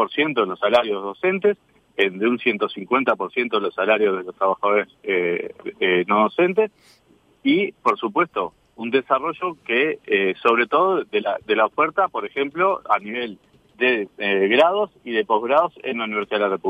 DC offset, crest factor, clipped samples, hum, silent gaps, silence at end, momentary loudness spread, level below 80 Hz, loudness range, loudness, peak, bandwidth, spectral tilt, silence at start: under 0.1%; 18 dB; under 0.1%; none; none; 0 s; 8 LU; -68 dBFS; 2 LU; -21 LUFS; -4 dBFS; 8 kHz; -6.5 dB/octave; 0 s